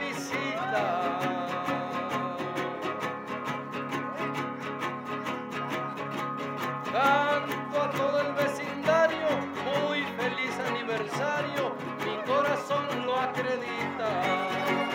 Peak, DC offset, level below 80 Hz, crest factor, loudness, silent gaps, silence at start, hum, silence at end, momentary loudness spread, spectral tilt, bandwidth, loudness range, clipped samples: -12 dBFS; under 0.1%; -78 dBFS; 18 dB; -30 LUFS; none; 0 s; none; 0 s; 8 LU; -5 dB/octave; 17 kHz; 6 LU; under 0.1%